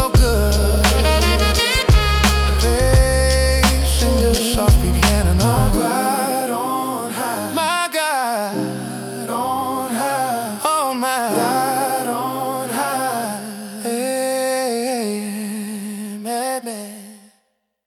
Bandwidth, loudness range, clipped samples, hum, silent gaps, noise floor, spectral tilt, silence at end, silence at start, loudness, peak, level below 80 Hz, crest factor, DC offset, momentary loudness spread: 17.5 kHz; 7 LU; under 0.1%; none; none; -67 dBFS; -4.5 dB/octave; 0.7 s; 0 s; -18 LUFS; -2 dBFS; -22 dBFS; 16 dB; under 0.1%; 11 LU